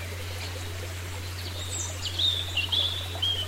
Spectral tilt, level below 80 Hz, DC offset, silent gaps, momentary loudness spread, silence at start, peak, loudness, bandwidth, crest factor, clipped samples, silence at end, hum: -2 dB/octave; -48 dBFS; under 0.1%; none; 11 LU; 0 s; -14 dBFS; -29 LUFS; 16 kHz; 16 dB; under 0.1%; 0 s; none